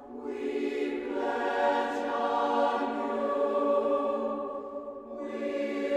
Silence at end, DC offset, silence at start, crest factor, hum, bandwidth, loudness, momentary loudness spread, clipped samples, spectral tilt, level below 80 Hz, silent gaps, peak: 0 s; under 0.1%; 0 s; 16 dB; none; 9.4 kHz; -30 LUFS; 11 LU; under 0.1%; -5 dB/octave; -68 dBFS; none; -14 dBFS